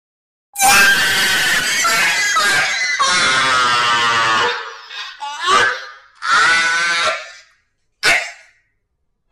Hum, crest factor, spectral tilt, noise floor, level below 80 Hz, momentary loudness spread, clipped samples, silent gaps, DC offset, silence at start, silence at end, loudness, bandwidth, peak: none; 16 dB; 0.5 dB/octave; -68 dBFS; -50 dBFS; 15 LU; under 0.1%; none; under 0.1%; 0.55 s; 0.95 s; -13 LUFS; 16 kHz; -2 dBFS